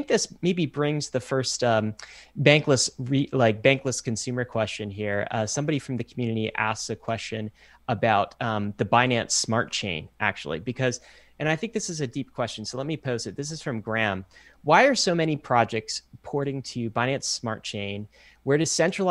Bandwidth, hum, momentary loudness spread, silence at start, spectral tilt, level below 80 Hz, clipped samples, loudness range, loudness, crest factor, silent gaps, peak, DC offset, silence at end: 12.5 kHz; none; 12 LU; 0 s; -4 dB/octave; -60 dBFS; under 0.1%; 6 LU; -25 LUFS; 24 dB; none; -2 dBFS; under 0.1%; 0 s